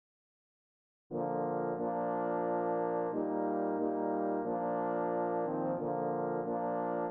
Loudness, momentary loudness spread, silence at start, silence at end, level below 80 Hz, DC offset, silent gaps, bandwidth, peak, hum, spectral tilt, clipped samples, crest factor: -35 LUFS; 2 LU; 1.1 s; 0 s; -82 dBFS; under 0.1%; none; 3.4 kHz; -20 dBFS; none; -9 dB/octave; under 0.1%; 14 dB